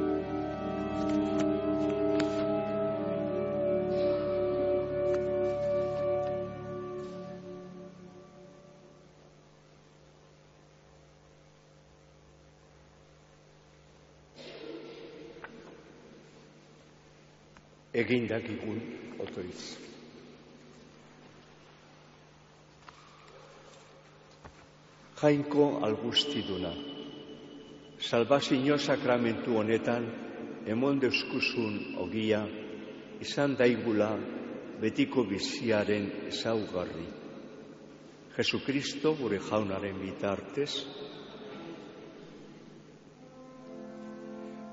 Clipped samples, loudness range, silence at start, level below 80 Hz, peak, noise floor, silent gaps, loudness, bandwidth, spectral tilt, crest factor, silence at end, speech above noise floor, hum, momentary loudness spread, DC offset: under 0.1%; 19 LU; 0 s; -62 dBFS; -12 dBFS; -59 dBFS; none; -31 LUFS; 7.6 kHz; -4 dB/octave; 22 dB; 0 s; 28 dB; 50 Hz at -60 dBFS; 24 LU; under 0.1%